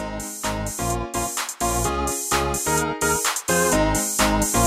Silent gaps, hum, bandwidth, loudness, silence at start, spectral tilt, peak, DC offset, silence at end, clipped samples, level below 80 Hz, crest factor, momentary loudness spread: none; none; 16 kHz; -22 LUFS; 0 s; -3 dB/octave; -6 dBFS; under 0.1%; 0 s; under 0.1%; -34 dBFS; 16 dB; 7 LU